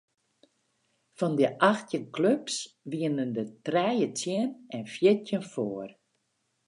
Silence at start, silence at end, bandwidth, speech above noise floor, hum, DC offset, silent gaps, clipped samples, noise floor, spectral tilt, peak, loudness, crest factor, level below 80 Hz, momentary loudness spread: 1.2 s; 0.75 s; 11 kHz; 49 dB; none; under 0.1%; none; under 0.1%; -77 dBFS; -5 dB/octave; -6 dBFS; -28 LUFS; 22 dB; -80 dBFS; 10 LU